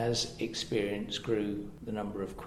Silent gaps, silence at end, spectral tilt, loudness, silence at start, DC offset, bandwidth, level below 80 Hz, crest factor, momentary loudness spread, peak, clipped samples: none; 0 s; -4.5 dB/octave; -34 LUFS; 0 s; under 0.1%; 14 kHz; -56 dBFS; 16 dB; 6 LU; -18 dBFS; under 0.1%